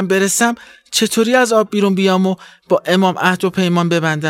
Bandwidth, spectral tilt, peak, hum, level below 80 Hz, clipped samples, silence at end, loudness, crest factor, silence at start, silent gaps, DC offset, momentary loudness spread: 16.5 kHz; -4.5 dB/octave; -2 dBFS; none; -60 dBFS; under 0.1%; 0 s; -15 LUFS; 14 dB; 0 s; none; under 0.1%; 6 LU